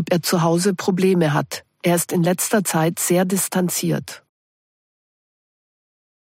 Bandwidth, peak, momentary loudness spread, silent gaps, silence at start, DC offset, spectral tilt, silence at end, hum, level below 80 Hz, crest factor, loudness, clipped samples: 16.5 kHz; -6 dBFS; 6 LU; none; 0 s; under 0.1%; -5 dB/octave; 2.1 s; none; -64 dBFS; 16 dB; -19 LUFS; under 0.1%